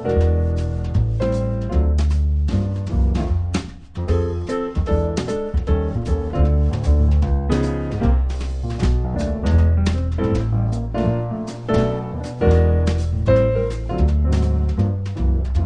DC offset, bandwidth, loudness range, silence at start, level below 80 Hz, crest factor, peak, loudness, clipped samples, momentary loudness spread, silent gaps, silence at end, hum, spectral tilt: 0.1%; 9.2 kHz; 3 LU; 0 s; -22 dBFS; 16 dB; -4 dBFS; -20 LUFS; under 0.1%; 7 LU; none; 0 s; none; -8 dB/octave